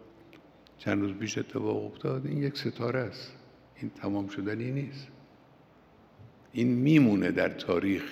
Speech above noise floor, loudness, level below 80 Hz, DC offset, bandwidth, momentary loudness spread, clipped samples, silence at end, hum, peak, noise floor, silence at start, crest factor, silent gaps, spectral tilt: 29 dB; -30 LUFS; -70 dBFS; under 0.1%; 14.5 kHz; 18 LU; under 0.1%; 0 s; none; -10 dBFS; -58 dBFS; 0 s; 22 dB; none; -7 dB/octave